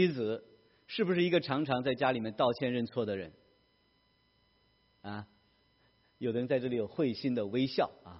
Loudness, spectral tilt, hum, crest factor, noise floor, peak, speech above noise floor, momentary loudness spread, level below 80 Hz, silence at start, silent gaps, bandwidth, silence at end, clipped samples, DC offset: -33 LUFS; -4.5 dB/octave; none; 20 dB; -71 dBFS; -14 dBFS; 39 dB; 14 LU; -72 dBFS; 0 s; none; 5.8 kHz; 0 s; under 0.1%; under 0.1%